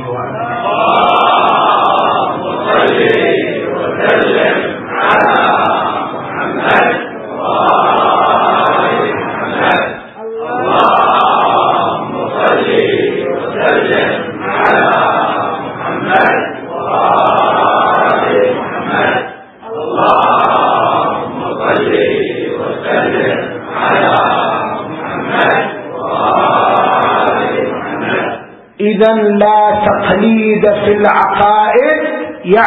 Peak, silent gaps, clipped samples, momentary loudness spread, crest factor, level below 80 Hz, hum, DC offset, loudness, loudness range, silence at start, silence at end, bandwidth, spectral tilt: 0 dBFS; none; under 0.1%; 9 LU; 12 dB; -50 dBFS; none; under 0.1%; -11 LUFS; 2 LU; 0 s; 0 s; 4.9 kHz; -7.5 dB/octave